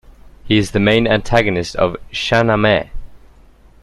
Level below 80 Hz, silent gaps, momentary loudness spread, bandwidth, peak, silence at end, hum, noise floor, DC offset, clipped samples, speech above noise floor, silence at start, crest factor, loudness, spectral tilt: -34 dBFS; none; 6 LU; 12.5 kHz; 0 dBFS; 0.65 s; none; -45 dBFS; under 0.1%; under 0.1%; 30 dB; 0.25 s; 16 dB; -15 LUFS; -5.5 dB/octave